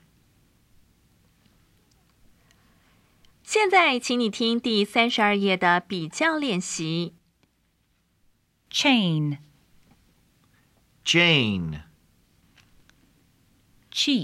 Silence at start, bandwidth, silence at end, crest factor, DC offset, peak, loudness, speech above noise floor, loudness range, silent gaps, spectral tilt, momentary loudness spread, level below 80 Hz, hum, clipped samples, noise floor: 3.45 s; 14.5 kHz; 0 s; 22 dB; under 0.1%; -6 dBFS; -22 LUFS; 46 dB; 6 LU; none; -4 dB/octave; 13 LU; -62 dBFS; none; under 0.1%; -68 dBFS